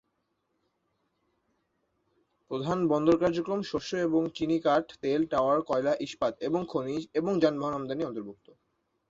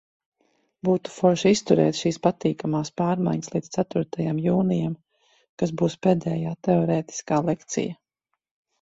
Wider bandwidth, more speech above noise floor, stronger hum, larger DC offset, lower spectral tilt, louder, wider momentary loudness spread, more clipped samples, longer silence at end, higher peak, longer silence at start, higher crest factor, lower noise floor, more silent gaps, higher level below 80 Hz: about the same, 7.8 kHz vs 8 kHz; second, 50 dB vs 58 dB; neither; neither; about the same, -6.5 dB/octave vs -6.5 dB/octave; second, -29 LUFS vs -24 LUFS; about the same, 8 LU vs 9 LU; neither; about the same, 0.75 s vs 0.85 s; second, -10 dBFS vs -4 dBFS; first, 2.5 s vs 0.85 s; about the same, 20 dB vs 20 dB; about the same, -78 dBFS vs -81 dBFS; second, none vs 5.49-5.57 s; about the same, -64 dBFS vs -62 dBFS